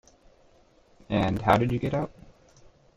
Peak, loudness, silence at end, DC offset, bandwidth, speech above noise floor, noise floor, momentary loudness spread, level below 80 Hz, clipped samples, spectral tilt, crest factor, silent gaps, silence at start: -6 dBFS; -26 LUFS; 0.9 s; under 0.1%; 15 kHz; 35 dB; -59 dBFS; 9 LU; -50 dBFS; under 0.1%; -7.5 dB/octave; 24 dB; none; 1.1 s